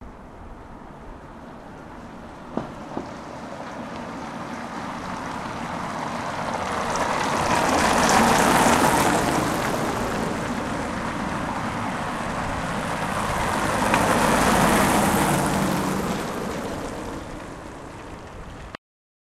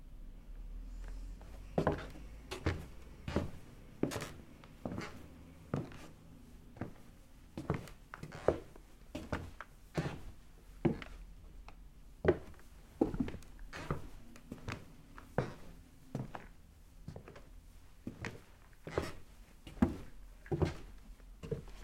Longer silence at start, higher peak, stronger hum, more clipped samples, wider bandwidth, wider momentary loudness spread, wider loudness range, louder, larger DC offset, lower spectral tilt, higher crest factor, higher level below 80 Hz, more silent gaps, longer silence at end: about the same, 0 s vs 0 s; first, 0 dBFS vs -14 dBFS; neither; neither; about the same, 16 kHz vs 16.5 kHz; about the same, 22 LU vs 22 LU; first, 15 LU vs 7 LU; first, -23 LUFS vs -42 LUFS; neither; second, -4 dB/octave vs -7 dB/octave; about the same, 24 dB vs 28 dB; first, -42 dBFS vs -52 dBFS; neither; first, 0.6 s vs 0 s